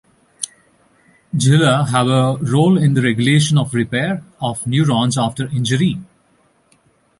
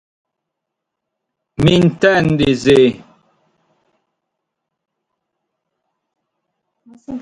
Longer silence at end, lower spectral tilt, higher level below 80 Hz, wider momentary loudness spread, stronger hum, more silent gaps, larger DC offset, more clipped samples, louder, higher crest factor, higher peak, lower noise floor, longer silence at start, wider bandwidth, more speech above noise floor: first, 1.15 s vs 0 s; about the same, -5.5 dB/octave vs -6.5 dB/octave; second, -52 dBFS vs -44 dBFS; second, 12 LU vs 20 LU; neither; neither; neither; neither; second, -16 LUFS vs -13 LUFS; about the same, 16 dB vs 18 dB; about the same, 0 dBFS vs 0 dBFS; second, -57 dBFS vs -79 dBFS; second, 0.4 s vs 1.6 s; about the same, 11.5 kHz vs 11 kHz; second, 42 dB vs 67 dB